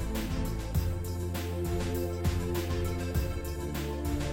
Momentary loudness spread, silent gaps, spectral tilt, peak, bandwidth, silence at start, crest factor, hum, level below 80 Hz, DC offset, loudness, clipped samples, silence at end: 3 LU; none; -6 dB/octave; -18 dBFS; 17 kHz; 0 s; 14 dB; none; -36 dBFS; 0.2%; -33 LUFS; under 0.1%; 0 s